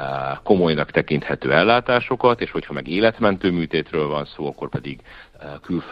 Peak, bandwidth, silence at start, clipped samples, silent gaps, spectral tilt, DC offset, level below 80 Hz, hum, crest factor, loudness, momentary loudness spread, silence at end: 0 dBFS; 5.8 kHz; 0 s; under 0.1%; none; -8.5 dB/octave; under 0.1%; -48 dBFS; none; 20 dB; -20 LUFS; 13 LU; 0 s